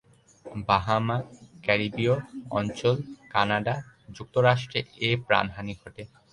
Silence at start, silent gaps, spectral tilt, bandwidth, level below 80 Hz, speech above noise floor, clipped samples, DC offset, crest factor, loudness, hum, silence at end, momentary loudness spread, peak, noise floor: 0.45 s; none; -6 dB/octave; 11 kHz; -54 dBFS; 22 dB; under 0.1%; under 0.1%; 22 dB; -26 LUFS; none; 0.25 s; 18 LU; -4 dBFS; -48 dBFS